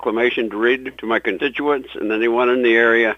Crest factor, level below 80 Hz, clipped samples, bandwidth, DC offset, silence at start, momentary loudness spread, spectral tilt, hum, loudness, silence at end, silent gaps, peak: 18 dB; -56 dBFS; under 0.1%; 6.4 kHz; under 0.1%; 0 s; 8 LU; -5.5 dB/octave; none; -18 LUFS; 0 s; none; 0 dBFS